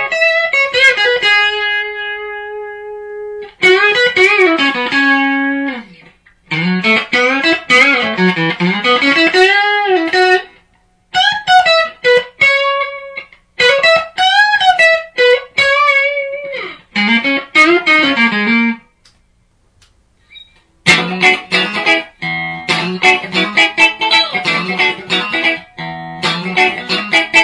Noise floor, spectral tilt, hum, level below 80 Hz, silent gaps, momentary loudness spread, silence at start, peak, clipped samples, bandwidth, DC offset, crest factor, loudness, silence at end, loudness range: -55 dBFS; -3.5 dB/octave; none; -54 dBFS; none; 13 LU; 0 s; 0 dBFS; under 0.1%; 10.5 kHz; under 0.1%; 14 dB; -11 LUFS; 0 s; 3 LU